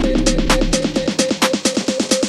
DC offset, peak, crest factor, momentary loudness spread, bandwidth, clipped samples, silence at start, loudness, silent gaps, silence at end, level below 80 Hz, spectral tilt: under 0.1%; 0 dBFS; 16 dB; 2 LU; 14 kHz; under 0.1%; 0 s; -17 LUFS; none; 0 s; -24 dBFS; -3.5 dB/octave